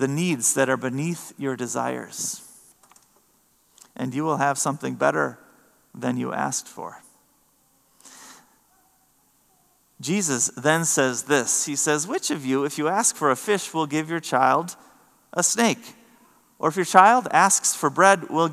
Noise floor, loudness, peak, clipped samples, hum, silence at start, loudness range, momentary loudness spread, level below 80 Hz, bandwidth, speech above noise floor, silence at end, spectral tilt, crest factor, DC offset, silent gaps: -63 dBFS; -22 LUFS; 0 dBFS; under 0.1%; none; 0 s; 12 LU; 12 LU; -76 dBFS; 15 kHz; 41 dB; 0 s; -3 dB/octave; 24 dB; under 0.1%; none